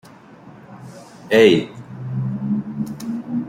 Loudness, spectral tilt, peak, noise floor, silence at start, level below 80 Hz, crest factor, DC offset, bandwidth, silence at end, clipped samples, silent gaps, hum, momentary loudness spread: -19 LUFS; -6.5 dB/octave; -2 dBFS; -43 dBFS; 0.05 s; -60 dBFS; 20 dB; under 0.1%; 15.5 kHz; 0 s; under 0.1%; none; none; 26 LU